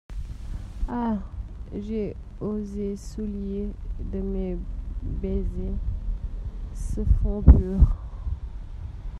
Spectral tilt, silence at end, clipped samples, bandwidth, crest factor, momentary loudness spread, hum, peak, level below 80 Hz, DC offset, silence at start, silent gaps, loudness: -9.5 dB/octave; 0 s; under 0.1%; 8.4 kHz; 24 dB; 17 LU; none; 0 dBFS; -26 dBFS; under 0.1%; 0.1 s; none; -28 LUFS